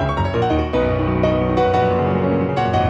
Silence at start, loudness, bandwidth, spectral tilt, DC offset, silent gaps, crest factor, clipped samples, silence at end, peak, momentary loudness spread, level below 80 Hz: 0 s; -18 LUFS; 7.8 kHz; -8 dB/octave; under 0.1%; none; 12 dB; under 0.1%; 0 s; -4 dBFS; 2 LU; -32 dBFS